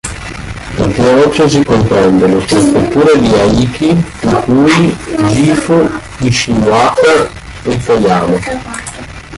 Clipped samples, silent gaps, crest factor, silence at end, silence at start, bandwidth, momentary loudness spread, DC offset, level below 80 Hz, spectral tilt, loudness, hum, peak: under 0.1%; none; 10 dB; 0 s; 0.05 s; 11.5 kHz; 13 LU; under 0.1%; -30 dBFS; -5.5 dB/octave; -10 LUFS; none; 0 dBFS